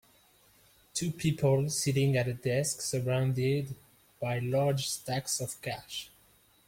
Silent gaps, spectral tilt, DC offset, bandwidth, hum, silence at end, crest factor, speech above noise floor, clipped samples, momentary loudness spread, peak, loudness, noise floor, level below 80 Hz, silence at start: none; -5 dB/octave; under 0.1%; 16.5 kHz; none; 0.6 s; 16 dB; 34 dB; under 0.1%; 11 LU; -16 dBFS; -31 LUFS; -64 dBFS; -62 dBFS; 0.95 s